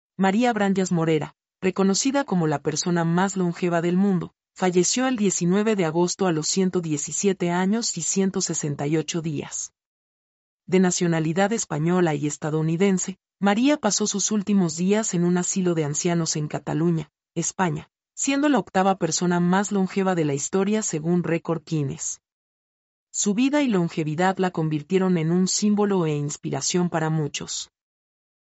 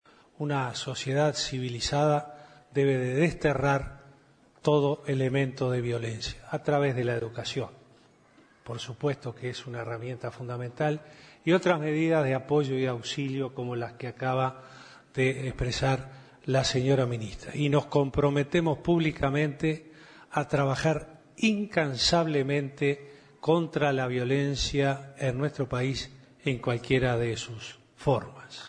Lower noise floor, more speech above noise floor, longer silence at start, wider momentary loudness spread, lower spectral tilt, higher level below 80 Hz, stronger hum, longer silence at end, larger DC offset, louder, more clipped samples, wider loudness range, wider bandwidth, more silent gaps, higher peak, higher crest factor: first, under -90 dBFS vs -60 dBFS; first, over 68 dB vs 32 dB; second, 0.2 s vs 0.4 s; second, 7 LU vs 11 LU; about the same, -5 dB/octave vs -5.5 dB/octave; second, -66 dBFS vs -50 dBFS; neither; first, 0.9 s vs 0 s; neither; first, -23 LUFS vs -28 LUFS; neither; about the same, 3 LU vs 5 LU; second, 8.2 kHz vs 10 kHz; first, 9.86-10.58 s, 22.32-23.07 s vs none; about the same, -8 dBFS vs -8 dBFS; about the same, 16 dB vs 20 dB